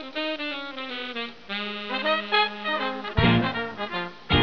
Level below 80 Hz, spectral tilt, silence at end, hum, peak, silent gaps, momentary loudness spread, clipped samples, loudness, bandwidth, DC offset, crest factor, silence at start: -42 dBFS; -7 dB/octave; 0 s; none; -4 dBFS; none; 11 LU; under 0.1%; -26 LUFS; 5.4 kHz; 0.4%; 22 dB; 0 s